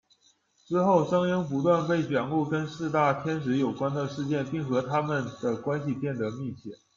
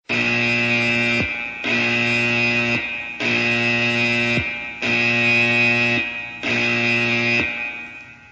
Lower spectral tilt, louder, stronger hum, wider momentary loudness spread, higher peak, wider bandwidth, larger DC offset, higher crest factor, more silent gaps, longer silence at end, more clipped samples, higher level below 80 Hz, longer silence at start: first, -7.5 dB/octave vs -4.5 dB/octave; second, -28 LUFS vs -18 LUFS; neither; about the same, 8 LU vs 10 LU; about the same, -8 dBFS vs -6 dBFS; second, 7.4 kHz vs 9.6 kHz; neither; about the same, 18 dB vs 14 dB; neither; first, 0.2 s vs 0.05 s; neither; second, -66 dBFS vs -50 dBFS; first, 0.7 s vs 0.1 s